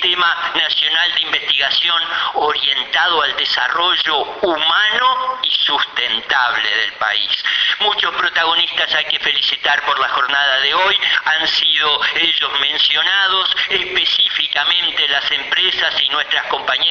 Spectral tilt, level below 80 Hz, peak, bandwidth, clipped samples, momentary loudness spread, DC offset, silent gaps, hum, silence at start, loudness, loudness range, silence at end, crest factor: -1 dB/octave; -56 dBFS; 0 dBFS; 7.2 kHz; under 0.1%; 4 LU; under 0.1%; none; none; 0 s; -14 LUFS; 2 LU; 0 s; 16 dB